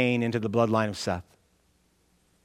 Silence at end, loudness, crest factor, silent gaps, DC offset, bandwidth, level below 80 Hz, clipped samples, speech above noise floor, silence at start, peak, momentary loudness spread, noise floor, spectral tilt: 1.25 s; -27 LUFS; 20 dB; none; under 0.1%; 14 kHz; -64 dBFS; under 0.1%; 41 dB; 0 s; -8 dBFS; 8 LU; -67 dBFS; -6 dB/octave